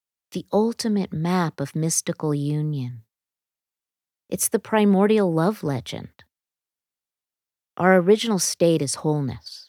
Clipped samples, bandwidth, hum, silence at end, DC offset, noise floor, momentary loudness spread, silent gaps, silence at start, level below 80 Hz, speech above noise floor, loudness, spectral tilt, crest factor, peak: under 0.1%; 17.5 kHz; none; 0.05 s; under 0.1%; under -90 dBFS; 14 LU; none; 0.35 s; -64 dBFS; over 68 dB; -22 LUFS; -5 dB/octave; 20 dB; -4 dBFS